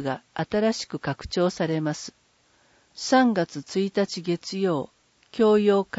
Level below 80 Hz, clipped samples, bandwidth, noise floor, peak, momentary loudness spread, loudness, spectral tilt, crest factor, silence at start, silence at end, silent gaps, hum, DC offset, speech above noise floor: -56 dBFS; under 0.1%; 8 kHz; -63 dBFS; -8 dBFS; 12 LU; -25 LUFS; -5.5 dB/octave; 16 dB; 0 s; 0 s; none; none; under 0.1%; 39 dB